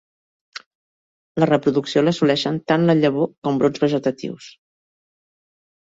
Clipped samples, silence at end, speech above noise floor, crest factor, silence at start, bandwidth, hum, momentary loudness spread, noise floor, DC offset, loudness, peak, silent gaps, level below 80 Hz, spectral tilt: under 0.1%; 1.35 s; over 71 dB; 18 dB; 0.55 s; 7.8 kHz; none; 21 LU; under -90 dBFS; under 0.1%; -19 LUFS; -2 dBFS; 0.66-1.35 s, 3.38-3.42 s; -62 dBFS; -6.5 dB/octave